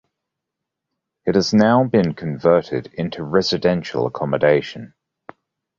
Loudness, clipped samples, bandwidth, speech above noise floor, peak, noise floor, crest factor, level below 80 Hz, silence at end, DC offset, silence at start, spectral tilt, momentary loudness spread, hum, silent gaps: -19 LUFS; under 0.1%; 7.6 kHz; 64 dB; -2 dBFS; -82 dBFS; 18 dB; -52 dBFS; 0.9 s; under 0.1%; 1.25 s; -6.5 dB/octave; 12 LU; none; none